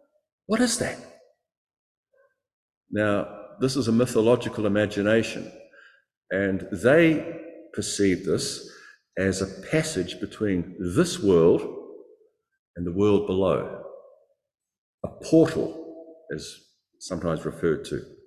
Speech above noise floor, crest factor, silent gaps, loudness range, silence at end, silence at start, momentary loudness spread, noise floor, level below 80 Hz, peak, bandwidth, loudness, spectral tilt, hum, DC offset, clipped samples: 43 dB; 20 dB; 1.57-1.67 s, 1.77-2.03 s, 2.53-2.69 s, 2.77-2.81 s, 6.17-6.21 s, 12.59-12.74 s, 14.78-14.98 s; 4 LU; 0.1 s; 0.5 s; 19 LU; -66 dBFS; -52 dBFS; -6 dBFS; 14.5 kHz; -24 LUFS; -5.5 dB/octave; none; under 0.1%; under 0.1%